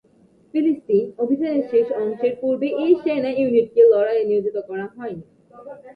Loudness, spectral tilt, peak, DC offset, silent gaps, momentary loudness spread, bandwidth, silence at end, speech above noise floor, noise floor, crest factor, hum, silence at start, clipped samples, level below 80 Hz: -20 LUFS; -9 dB/octave; -4 dBFS; under 0.1%; none; 16 LU; 5 kHz; 0.05 s; 36 dB; -55 dBFS; 16 dB; none; 0.55 s; under 0.1%; -66 dBFS